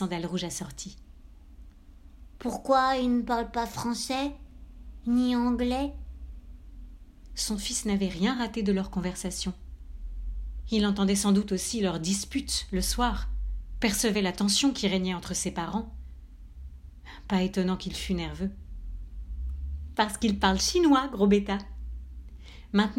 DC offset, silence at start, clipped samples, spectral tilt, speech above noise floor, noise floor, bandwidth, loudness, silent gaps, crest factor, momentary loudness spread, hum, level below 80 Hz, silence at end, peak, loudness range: under 0.1%; 0 s; under 0.1%; -4.5 dB/octave; 23 dB; -50 dBFS; 16 kHz; -28 LUFS; none; 20 dB; 21 LU; none; -40 dBFS; 0 s; -10 dBFS; 6 LU